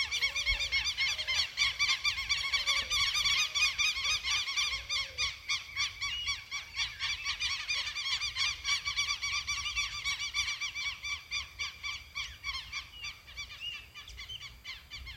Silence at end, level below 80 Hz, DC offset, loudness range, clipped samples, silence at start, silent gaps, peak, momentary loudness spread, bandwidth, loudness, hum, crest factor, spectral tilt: 0 s; -54 dBFS; under 0.1%; 10 LU; under 0.1%; 0 s; none; -16 dBFS; 15 LU; 16 kHz; -31 LUFS; none; 20 dB; 1.5 dB/octave